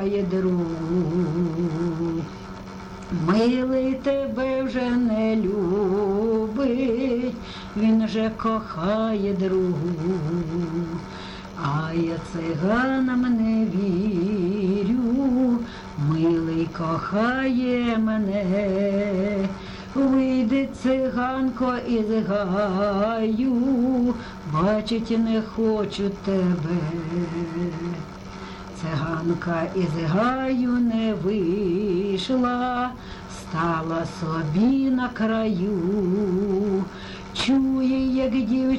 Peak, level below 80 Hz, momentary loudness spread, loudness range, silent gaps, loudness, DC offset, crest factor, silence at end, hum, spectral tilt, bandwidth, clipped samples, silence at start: -10 dBFS; -46 dBFS; 8 LU; 3 LU; none; -23 LUFS; under 0.1%; 14 dB; 0 s; none; -7.5 dB/octave; 9.2 kHz; under 0.1%; 0 s